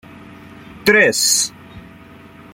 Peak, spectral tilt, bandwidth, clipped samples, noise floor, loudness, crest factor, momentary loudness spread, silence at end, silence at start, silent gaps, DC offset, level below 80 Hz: 0 dBFS; -1 dB/octave; 16.5 kHz; under 0.1%; -41 dBFS; -14 LUFS; 18 dB; 8 LU; 0.75 s; 0.15 s; none; under 0.1%; -52 dBFS